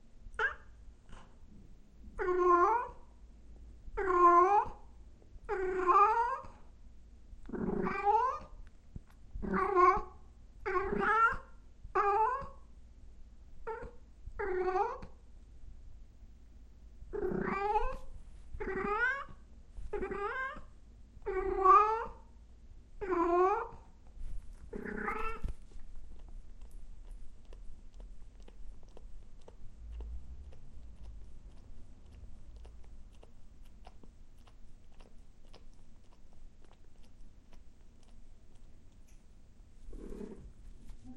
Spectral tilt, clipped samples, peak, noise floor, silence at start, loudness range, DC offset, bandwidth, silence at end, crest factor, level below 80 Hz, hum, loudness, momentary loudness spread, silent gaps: -7 dB/octave; under 0.1%; -12 dBFS; -55 dBFS; 0.05 s; 23 LU; under 0.1%; 9 kHz; 0 s; 24 dB; -48 dBFS; none; -32 LUFS; 29 LU; none